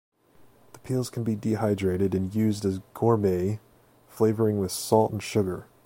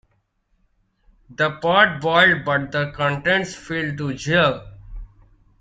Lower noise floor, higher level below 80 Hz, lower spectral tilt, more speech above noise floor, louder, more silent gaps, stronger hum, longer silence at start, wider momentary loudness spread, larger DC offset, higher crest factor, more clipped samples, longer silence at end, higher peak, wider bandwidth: second, -56 dBFS vs -66 dBFS; second, -58 dBFS vs -46 dBFS; first, -6.5 dB/octave vs -5 dB/octave; second, 31 dB vs 47 dB; second, -26 LUFS vs -19 LUFS; neither; neither; second, 0.75 s vs 1.3 s; second, 7 LU vs 11 LU; neither; about the same, 20 dB vs 20 dB; neither; second, 0.2 s vs 0.55 s; second, -6 dBFS vs -2 dBFS; first, 16.5 kHz vs 9.2 kHz